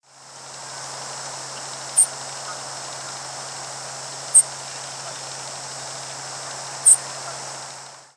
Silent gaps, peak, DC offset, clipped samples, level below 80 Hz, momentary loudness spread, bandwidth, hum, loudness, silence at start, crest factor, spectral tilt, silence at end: none; -2 dBFS; under 0.1%; under 0.1%; -74 dBFS; 18 LU; 11 kHz; none; -22 LUFS; 0.1 s; 24 dB; 0.5 dB/octave; 0.1 s